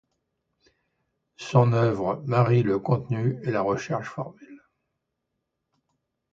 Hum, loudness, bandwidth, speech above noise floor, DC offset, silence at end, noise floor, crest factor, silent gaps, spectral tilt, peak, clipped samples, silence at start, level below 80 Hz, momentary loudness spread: none; -24 LUFS; 7.4 kHz; 57 dB; under 0.1%; 1.75 s; -81 dBFS; 22 dB; none; -8 dB/octave; -4 dBFS; under 0.1%; 1.4 s; -60 dBFS; 14 LU